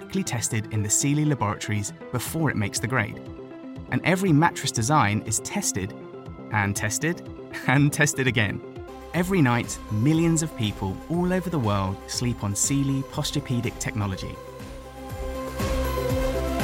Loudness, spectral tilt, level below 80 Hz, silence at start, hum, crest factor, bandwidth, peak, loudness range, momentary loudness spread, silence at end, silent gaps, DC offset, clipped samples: -25 LUFS; -4.5 dB/octave; -40 dBFS; 0 s; none; 20 dB; 16.5 kHz; -6 dBFS; 4 LU; 16 LU; 0 s; none; under 0.1%; under 0.1%